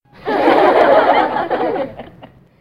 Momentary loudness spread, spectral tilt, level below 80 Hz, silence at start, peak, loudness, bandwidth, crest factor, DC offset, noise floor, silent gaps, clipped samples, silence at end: 11 LU; -6 dB/octave; -52 dBFS; 0.25 s; 0 dBFS; -14 LUFS; 12.5 kHz; 14 dB; 0.3%; -42 dBFS; none; under 0.1%; 0.35 s